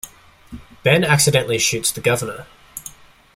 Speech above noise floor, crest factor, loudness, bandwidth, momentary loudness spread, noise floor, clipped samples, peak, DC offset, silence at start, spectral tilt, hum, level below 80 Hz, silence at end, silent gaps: 25 dB; 18 dB; -17 LUFS; 16.5 kHz; 22 LU; -43 dBFS; under 0.1%; -2 dBFS; under 0.1%; 0.05 s; -3.5 dB/octave; none; -50 dBFS; 0.45 s; none